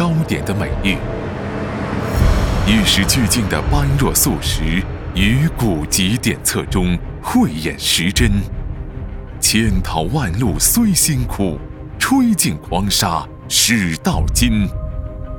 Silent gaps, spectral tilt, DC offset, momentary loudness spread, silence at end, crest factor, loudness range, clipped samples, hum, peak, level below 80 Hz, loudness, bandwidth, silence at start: none; -4 dB/octave; under 0.1%; 11 LU; 0 s; 16 dB; 2 LU; under 0.1%; none; 0 dBFS; -24 dBFS; -16 LUFS; 19.5 kHz; 0 s